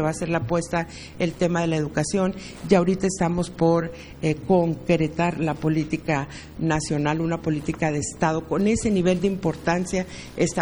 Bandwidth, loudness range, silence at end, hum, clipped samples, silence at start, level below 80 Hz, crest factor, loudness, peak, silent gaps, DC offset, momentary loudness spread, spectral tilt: over 20 kHz; 2 LU; 0 s; none; under 0.1%; 0 s; -44 dBFS; 20 dB; -24 LUFS; -4 dBFS; none; under 0.1%; 7 LU; -6 dB/octave